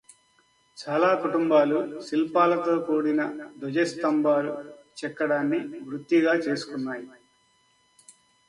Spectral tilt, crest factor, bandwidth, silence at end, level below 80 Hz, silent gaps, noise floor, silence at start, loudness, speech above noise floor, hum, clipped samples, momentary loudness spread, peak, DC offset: -6 dB/octave; 18 dB; 11 kHz; 1.4 s; -74 dBFS; none; -65 dBFS; 0.75 s; -25 LUFS; 40 dB; none; under 0.1%; 14 LU; -8 dBFS; under 0.1%